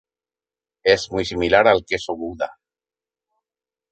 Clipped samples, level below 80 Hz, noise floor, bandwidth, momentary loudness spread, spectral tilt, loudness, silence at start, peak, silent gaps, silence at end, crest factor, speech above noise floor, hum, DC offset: under 0.1%; -48 dBFS; under -90 dBFS; 8.8 kHz; 13 LU; -4 dB/octave; -20 LUFS; 0.85 s; -2 dBFS; none; 1.4 s; 22 dB; over 71 dB; none; under 0.1%